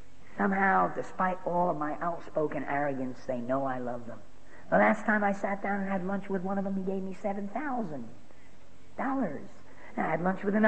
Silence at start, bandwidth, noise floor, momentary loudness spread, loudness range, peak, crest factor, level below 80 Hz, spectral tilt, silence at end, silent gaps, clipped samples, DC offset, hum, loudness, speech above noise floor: 0.3 s; 8.6 kHz; -57 dBFS; 15 LU; 5 LU; -10 dBFS; 20 dB; -64 dBFS; -8 dB/octave; 0 s; none; under 0.1%; 1%; none; -31 LUFS; 27 dB